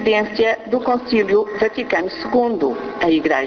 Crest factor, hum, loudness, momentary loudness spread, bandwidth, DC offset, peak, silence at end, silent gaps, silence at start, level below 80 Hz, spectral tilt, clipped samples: 14 dB; none; -18 LUFS; 4 LU; 6.6 kHz; under 0.1%; -4 dBFS; 0 s; none; 0 s; -52 dBFS; -5.5 dB/octave; under 0.1%